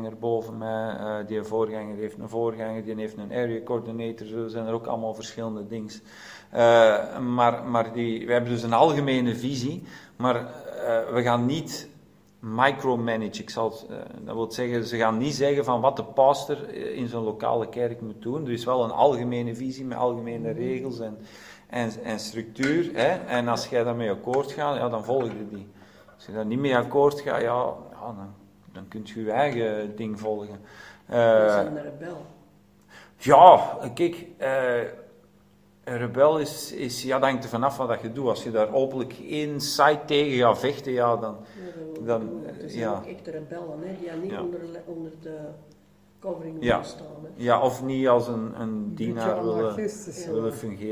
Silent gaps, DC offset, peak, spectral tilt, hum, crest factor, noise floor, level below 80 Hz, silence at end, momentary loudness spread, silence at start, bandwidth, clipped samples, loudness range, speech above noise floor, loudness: none; under 0.1%; 0 dBFS; -5.5 dB/octave; none; 26 dB; -58 dBFS; -62 dBFS; 0 s; 17 LU; 0 s; 16 kHz; under 0.1%; 10 LU; 32 dB; -25 LUFS